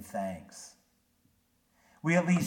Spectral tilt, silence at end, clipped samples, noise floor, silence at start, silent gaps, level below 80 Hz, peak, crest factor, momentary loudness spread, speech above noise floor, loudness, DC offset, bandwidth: -6.5 dB/octave; 0 s; under 0.1%; -72 dBFS; 0 s; none; -70 dBFS; -14 dBFS; 20 dB; 21 LU; 42 dB; -31 LUFS; under 0.1%; 16 kHz